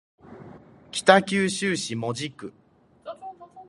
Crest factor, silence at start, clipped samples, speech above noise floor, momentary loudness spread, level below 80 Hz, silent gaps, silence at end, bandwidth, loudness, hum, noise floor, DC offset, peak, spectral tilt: 26 dB; 0.25 s; under 0.1%; 25 dB; 25 LU; -66 dBFS; none; 0.05 s; 11.5 kHz; -23 LUFS; none; -48 dBFS; under 0.1%; 0 dBFS; -4 dB/octave